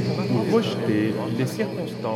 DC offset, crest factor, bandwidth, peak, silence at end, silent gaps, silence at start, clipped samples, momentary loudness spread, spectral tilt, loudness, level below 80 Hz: under 0.1%; 16 dB; 15.5 kHz; -8 dBFS; 0 s; none; 0 s; under 0.1%; 6 LU; -7 dB/octave; -24 LUFS; -64 dBFS